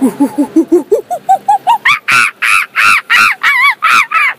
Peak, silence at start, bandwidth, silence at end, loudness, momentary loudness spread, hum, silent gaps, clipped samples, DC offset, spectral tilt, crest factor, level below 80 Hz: 0 dBFS; 0 s; 16 kHz; 0.05 s; -8 LUFS; 6 LU; none; none; 0.3%; under 0.1%; -2 dB/octave; 10 dB; -56 dBFS